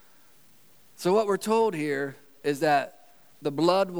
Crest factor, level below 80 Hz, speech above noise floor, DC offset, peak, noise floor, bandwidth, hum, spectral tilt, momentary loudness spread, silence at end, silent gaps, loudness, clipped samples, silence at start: 18 dB; -84 dBFS; 35 dB; 0.2%; -10 dBFS; -59 dBFS; over 20 kHz; none; -5 dB/octave; 10 LU; 0 s; none; -26 LUFS; under 0.1%; 1 s